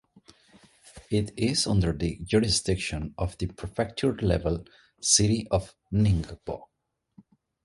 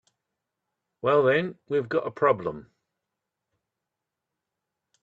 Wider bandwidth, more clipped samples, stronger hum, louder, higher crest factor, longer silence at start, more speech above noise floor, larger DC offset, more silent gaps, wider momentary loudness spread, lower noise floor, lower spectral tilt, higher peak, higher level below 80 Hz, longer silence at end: first, 11.5 kHz vs 7.4 kHz; neither; neither; about the same, -26 LUFS vs -25 LUFS; about the same, 22 dB vs 20 dB; about the same, 0.95 s vs 1.05 s; second, 34 dB vs 61 dB; neither; neither; about the same, 12 LU vs 10 LU; second, -60 dBFS vs -86 dBFS; second, -4.5 dB/octave vs -8 dB/octave; about the same, -6 dBFS vs -8 dBFS; first, -42 dBFS vs -70 dBFS; second, 1 s vs 2.4 s